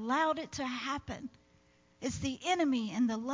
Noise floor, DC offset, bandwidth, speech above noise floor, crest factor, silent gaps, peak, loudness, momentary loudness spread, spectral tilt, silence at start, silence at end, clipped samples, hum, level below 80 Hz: -66 dBFS; under 0.1%; 7.6 kHz; 33 dB; 16 dB; none; -18 dBFS; -34 LUFS; 12 LU; -4 dB/octave; 0 s; 0 s; under 0.1%; none; -58 dBFS